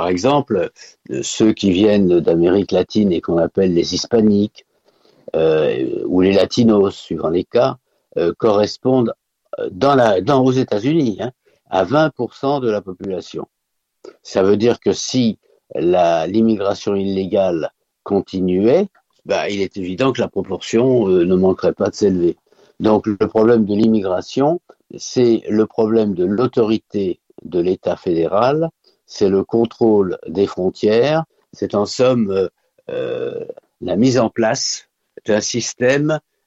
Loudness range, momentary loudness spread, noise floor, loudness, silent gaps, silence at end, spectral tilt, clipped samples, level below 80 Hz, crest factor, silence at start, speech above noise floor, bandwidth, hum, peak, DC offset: 4 LU; 11 LU; -74 dBFS; -17 LUFS; none; 0.25 s; -6 dB/octave; under 0.1%; -52 dBFS; 14 dB; 0 s; 58 dB; 8 kHz; none; -2 dBFS; under 0.1%